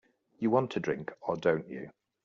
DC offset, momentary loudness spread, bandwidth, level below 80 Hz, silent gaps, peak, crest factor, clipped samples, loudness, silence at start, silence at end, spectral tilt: under 0.1%; 15 LU; 7.4 kHz; -70 dBFS; none; -12 dBFS; 20 dB; under 0.1%; -31 LUFS; 0.4 s; 0.35 s; -6 dB/octave